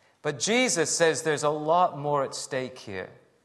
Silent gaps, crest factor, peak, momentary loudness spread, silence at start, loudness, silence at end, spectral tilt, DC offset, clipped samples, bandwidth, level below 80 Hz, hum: none; 18 dB; -8 dBFS; 15 LU; 0.25 s; -25 LUFS; 0.3 s; -3 dB/octave; under 0.1%; under 0.1%; 12.5 kHz; -74 dBFS; none